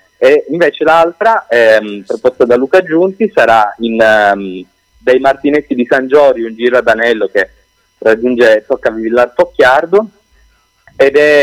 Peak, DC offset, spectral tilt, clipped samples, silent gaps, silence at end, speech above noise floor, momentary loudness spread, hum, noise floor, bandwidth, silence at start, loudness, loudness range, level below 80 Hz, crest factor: 0 dBFS; under 0.1%; -5 dB/octave; under 0.1%; none; 0 s; 41 dB; 7 LU; none; -51 dBFS; 14 kHz; 0.2 s; -10 LUFS; 2 LU; -48 dBFS; 10 dB